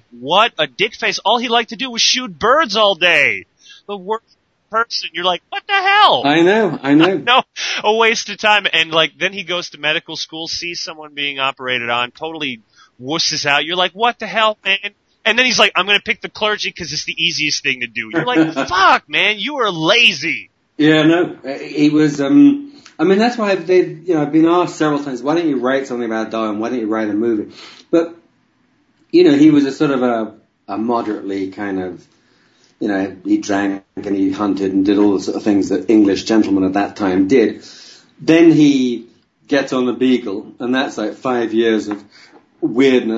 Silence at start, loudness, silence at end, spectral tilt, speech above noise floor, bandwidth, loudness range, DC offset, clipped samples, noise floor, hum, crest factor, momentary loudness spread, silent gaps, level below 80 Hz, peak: 0.15 s; -15 LUFS; 0 s; -4 dB/octave; 44 dB; 8 kHz; 6 LU; under 0.1%; under 0.1%; -59 dBFS; none; 16 dB; 12 LU; none; -60 dBFS; 0 dBFS